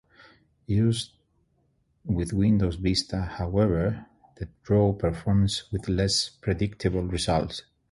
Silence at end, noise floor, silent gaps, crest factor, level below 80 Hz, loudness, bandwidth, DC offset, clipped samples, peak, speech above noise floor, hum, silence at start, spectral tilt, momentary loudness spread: 0.3 s; -69 dBFS; none; 16 dB; -40 dBFS; -26 LUFS; 11.5 kHz; under 0.1%; under 0.1%; -10 dBFS; 44 dB; none; 0.7 s; -6 dB/octave; 14 LU